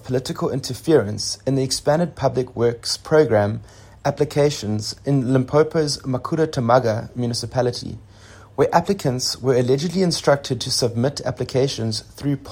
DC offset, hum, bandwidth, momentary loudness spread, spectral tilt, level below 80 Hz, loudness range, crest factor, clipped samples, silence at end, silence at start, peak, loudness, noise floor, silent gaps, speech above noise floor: under 0.1%; none; 16.5 kHz; 8 LU; -5 dB/octave; -50 dBFS; 1 LU; 18 dB; under 0.1%; 0 s; 0 s; -2 dBFS; -21 LUFS; -44 dBFS; none; 24 dB